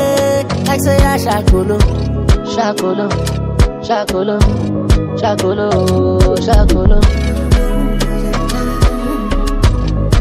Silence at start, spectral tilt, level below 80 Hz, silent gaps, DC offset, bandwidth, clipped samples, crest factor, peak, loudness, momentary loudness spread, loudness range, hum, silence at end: 0 s; -6 dB/octave; -16 dBFS; none; under 0.1%; 16 kHz; under 0.1%; 12 dB; 0 dBFS; -14 LUFS; 5 LU; 2 LU; none; 0 s